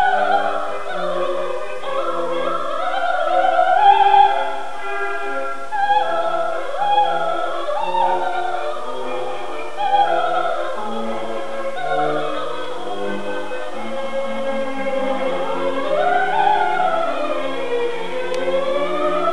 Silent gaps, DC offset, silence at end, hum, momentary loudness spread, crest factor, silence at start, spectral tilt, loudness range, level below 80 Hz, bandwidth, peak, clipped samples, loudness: none; 7%; 0 s; none; 10 LU; 18 dB; 0 s; -4 dB/octave; 7 LU; -66 dBFS; 11 kHz; -2 dBFS; under 0.1%; -20 LUFS